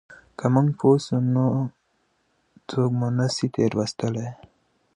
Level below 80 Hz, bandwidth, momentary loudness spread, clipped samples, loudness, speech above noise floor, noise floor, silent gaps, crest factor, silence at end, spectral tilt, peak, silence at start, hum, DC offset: -62 dBFS; 10 kHz; 11 LU; under 0.1%; -23 LUFS; 47 dB; -69 dBFS; none; 18 dB; 0.6 s; -7 dB/octave; -4 dBFS; 0.1 s; none; under 0.1%